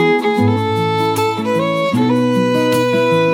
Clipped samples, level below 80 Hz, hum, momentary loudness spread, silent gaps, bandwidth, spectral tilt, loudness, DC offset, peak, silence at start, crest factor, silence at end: under 0.1%; -58 dBFS; none; 3 LU; none; 17 kHz; -6 dB/octave; -15 LUFS; under 0.1%; -2 dBFS; 0 s; 12 dB; 0 s